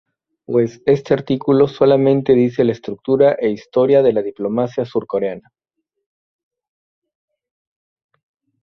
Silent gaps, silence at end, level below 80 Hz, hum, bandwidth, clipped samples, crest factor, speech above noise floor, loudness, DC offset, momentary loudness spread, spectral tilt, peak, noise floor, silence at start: none; 3.25 s; -56 dBFS; none; 6.4 kHz; under 0.1%; 16 dB; 61 dB; -16 LUFS; under 0.1%; 9 LU; -8.5 dB/octave; -2 dBFS; -76 dBFS; 0.5 s